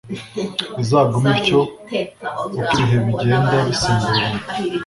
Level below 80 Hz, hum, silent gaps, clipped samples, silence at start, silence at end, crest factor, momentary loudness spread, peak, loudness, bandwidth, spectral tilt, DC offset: -44 dBFS; none; none; under 0.1%; 0.05 s; 0 s; 16 dB; 9 LU; -2 dBFS; -18 LUFS; 11.5 kHz; -5.5 dB/octave; under 0.1%